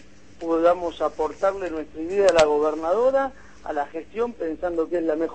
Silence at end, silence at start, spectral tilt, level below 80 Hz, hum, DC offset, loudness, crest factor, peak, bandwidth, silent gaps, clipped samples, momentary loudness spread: 0 s; 0.4 s; -4.5 dB/octave; -52 dBFS; none; 0.5%; -23 LUFS; 18 dB; -4 dBFS; 8.8 kHz; none; under 0.1%; 12 LU